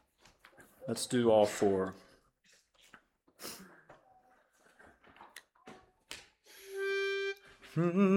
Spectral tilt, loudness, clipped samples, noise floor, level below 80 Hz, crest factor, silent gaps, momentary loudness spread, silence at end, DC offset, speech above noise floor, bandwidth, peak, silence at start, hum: -5.5 dB/octave; -33 LUFS; under 0.1%; -69 dBFS; -74 dBFS; 22 dB; none; 28 LU; 0 s; under 0.1%; 40 dB; 18 kHz; -14 dBFS; 0.6 s; none